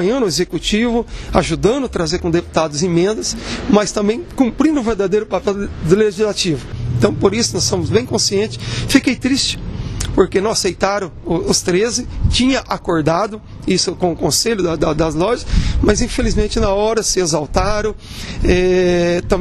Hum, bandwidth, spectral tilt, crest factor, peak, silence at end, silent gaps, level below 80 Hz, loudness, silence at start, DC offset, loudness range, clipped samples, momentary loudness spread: none; 13.5 kHz; -4.5 dB/octave; 16 dB; 0 dBFS; 0 s; none; -28 dBFS; -16 LUFS; 0 s; under 0.1%; 1 LU; under 0.1%; 7 LU